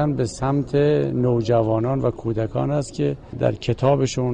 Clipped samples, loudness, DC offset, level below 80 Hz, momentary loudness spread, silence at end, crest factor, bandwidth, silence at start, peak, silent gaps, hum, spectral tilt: under 0.1%; -21 LUFS; under 0.1%; -42 dBFS; 5 LU; 0 s; 14 dB; 9.6 kHz; 0 s; -6 dBFS; none; none; -7 dB/octave